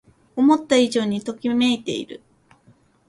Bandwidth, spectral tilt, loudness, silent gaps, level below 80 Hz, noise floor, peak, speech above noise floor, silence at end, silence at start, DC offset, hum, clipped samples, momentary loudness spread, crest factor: 11.5 kHz; -4.5 dB/octave; -20 LUFS; none; -62 dBFS; -56 dBFS; -4 dBFS; 37 dB; 0.9 s; 0.35 s; under 0.1%; none; under 0.1%; 13 LU; 18 dB